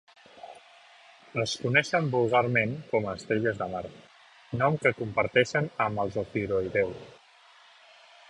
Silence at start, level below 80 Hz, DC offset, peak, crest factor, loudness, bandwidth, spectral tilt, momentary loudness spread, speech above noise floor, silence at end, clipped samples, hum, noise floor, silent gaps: 0.35 s; -60 dBFS; under 0.1%; -8 dBFS; 22 dB; -27 LUFS; 11 kHz; -5.5 dB/octave; 14 LU; 29 dB; 1.2 s; under 0.1%; none; -57 dBFS; none